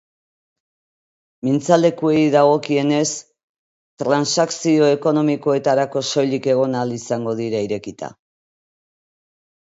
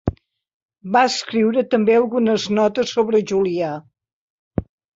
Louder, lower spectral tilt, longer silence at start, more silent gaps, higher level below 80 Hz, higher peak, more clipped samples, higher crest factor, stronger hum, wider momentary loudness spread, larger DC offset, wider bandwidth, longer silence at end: about the same, -18 LUFS vs -19 LUFS; about the same, -5 dB/octave vs -5.5 dB/octave; first, 1.45 s vs 0.05 s; about the same, 3.44-3.97 s vs 0.54-0.69 s, 4.13-4.51 s; second, -66 dBFS vs -44 dBFS; first, 0 dBFS vs -4 dBFS; neither; about the same, 20 dB vs 16 dB; neither; about the same, 11 LU vs 13 LU; neither; about the same, 8 kHz vs 8 kHz; first, 1.6 s vs 0.3 s